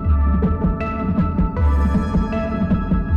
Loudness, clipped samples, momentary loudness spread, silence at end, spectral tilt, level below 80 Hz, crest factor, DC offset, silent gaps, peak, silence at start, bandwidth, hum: -20 LUFS; under 0.1%; 4 LU; 0 s; -10 dB/octave; -22 dBFS; 10 dB; under 0.1%; none; -8 dBFS; 0 s; 5.2 kHz; none